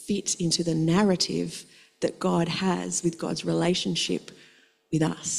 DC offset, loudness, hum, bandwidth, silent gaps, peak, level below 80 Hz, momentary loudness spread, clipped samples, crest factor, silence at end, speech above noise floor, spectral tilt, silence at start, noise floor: under 0.1%; -26 LUFS; none; 13 kHz; none; -8 dBFS; -58 dBFS; 9 LU; under 0.1%; 18 dB; 0 s; 32 dB; -4.5 dB/octave; 0 s; -58 dBFS